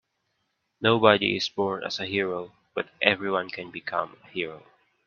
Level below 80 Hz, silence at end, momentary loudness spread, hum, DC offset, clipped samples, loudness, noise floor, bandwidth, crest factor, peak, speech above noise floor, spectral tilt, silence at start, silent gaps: -68 dBFS; 0.45 s; 15 LU; none; under 0.1%; under 0.1%; -26 LUFS; -76 dBFS; 7.2 kHz; 26 dB; 0 dBFS; 50 dB; -5 dB/octave; 0.8 s; none